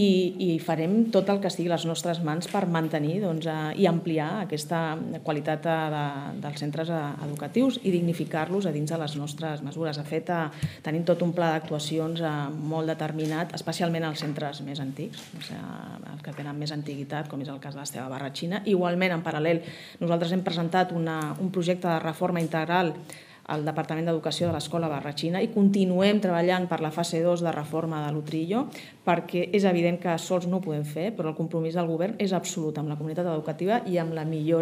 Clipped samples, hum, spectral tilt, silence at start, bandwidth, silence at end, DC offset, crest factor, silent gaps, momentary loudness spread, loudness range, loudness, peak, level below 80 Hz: under 0.1%; none; -6 dB/octave; 0 s; 15.5 kHz; 0 s; under 0.1%; 20 dB; none; 10 LU; 6 LU; -28 LUFS; -6 dBFS; -72 dBFS